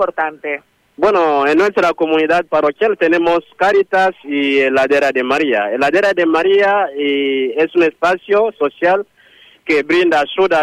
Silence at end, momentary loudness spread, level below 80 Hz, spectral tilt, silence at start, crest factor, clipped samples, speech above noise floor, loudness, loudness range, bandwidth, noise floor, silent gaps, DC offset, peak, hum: 0 s; 5 LU; -54 dBFS; -5 dB/octave; 0 s; 10 dB; under 0.1%; 33 dB; -14 LUFS; 2 LU; 11 kHz; -47 dBFS; none; under 0.1%; -4 dBFS; none